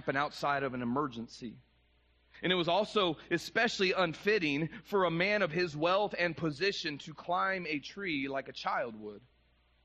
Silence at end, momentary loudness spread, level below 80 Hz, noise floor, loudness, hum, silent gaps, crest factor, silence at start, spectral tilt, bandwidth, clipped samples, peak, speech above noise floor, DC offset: 0.65 s; 10 LU; -66 dBFS; -69 dBFS; -32 LUFS; none; none; 18 dB; 0 s; -5 dB/octave; 9.6 kHz; under 0.1%; -16 dBFS; 36 dB; under 0.1%